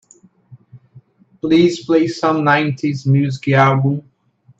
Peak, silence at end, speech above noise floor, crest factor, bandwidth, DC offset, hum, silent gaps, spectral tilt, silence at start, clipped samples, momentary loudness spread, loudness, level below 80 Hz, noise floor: 0 dBFS; 0.6 s; 34 dB; 16 dB; 8 kHz; under 0.1%; none; none; -7 dB/octave; 0.5 s; under 0.1%; 7 LU; -16 LUFS; -60 dBFS; -49 dBFS